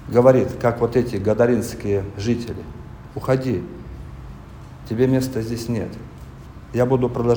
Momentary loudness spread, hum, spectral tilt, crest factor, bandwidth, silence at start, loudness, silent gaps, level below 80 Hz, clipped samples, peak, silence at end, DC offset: 21 LU; none; -7.5 dB/octave; 20 dB; over 20 kHz; 0 s; -21 LUFS; none; -42 dBFS; under 0.1%; 0 dBFS; 0 s; under 0.1%